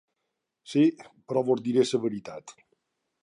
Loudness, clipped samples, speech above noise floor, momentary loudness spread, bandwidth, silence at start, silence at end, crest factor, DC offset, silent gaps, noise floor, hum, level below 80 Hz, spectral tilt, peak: -26 LUFS; under 0.1%; 57 dB; 15 LU; 11 kHz; 0.7 s; 0.7 s; 18 dB; under 0.1%; none; -82 dBFS; none; -76 dBFS; -6 dB/octave; -10 dBFS